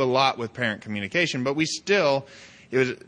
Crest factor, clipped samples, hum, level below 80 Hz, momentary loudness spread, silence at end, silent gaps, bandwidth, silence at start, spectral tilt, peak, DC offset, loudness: 18 dB; under 0.1%; none; -66 dBFS; 7 LU; 0.1 s; none; 10 kHz; 0 s; -4 dB/octave; -6 dBFS; under 0.1%; -24 LUFS